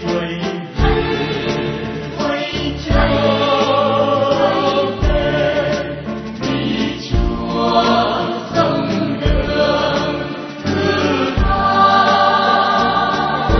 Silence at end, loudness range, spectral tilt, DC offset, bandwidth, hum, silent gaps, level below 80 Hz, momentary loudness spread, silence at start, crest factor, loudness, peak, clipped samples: 0 s; 3 LU; -6 dB/octave; under 0.1%; 6.4 kHz; none; none; -26 dBFS; 9 LU; 0 s; 16 dB; -16 LUFS; 0 dBFS; under 0.1%